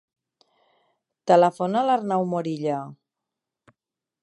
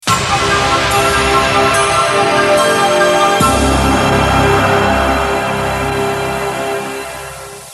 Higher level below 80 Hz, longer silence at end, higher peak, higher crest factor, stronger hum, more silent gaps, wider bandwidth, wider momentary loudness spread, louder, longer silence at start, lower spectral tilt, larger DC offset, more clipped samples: second, -78 dBFS vs -28 dBFS; first, 1.3 s vs 0 s; about the same, -4 dBFS vs -2 dBFS; first, 20 dB vs 12 dB; second, none vs 50 Hz at -30 dBFS; neither; second, 11 kHz vs 14 kHz; first, 14 LU vs 8 LU; second, -22 LUFS vs -12 LUFS; first, 1.25 s vs 0.05 s; first, -7 dB/octave vs -4 dB/octave; neither; neither